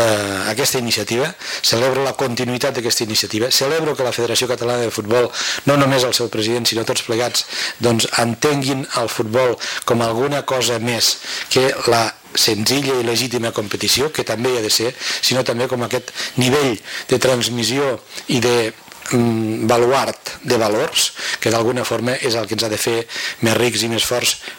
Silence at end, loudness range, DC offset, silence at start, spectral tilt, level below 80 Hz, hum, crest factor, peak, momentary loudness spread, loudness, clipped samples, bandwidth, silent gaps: 0 s; 1 LU; under 0.1%; 0 s; -3.5 dB/octave; -54 dBFS; none; 12 dB; -6 dBFS; 5 LU; -17 LUFS; under 0.1%; 17 kHz; none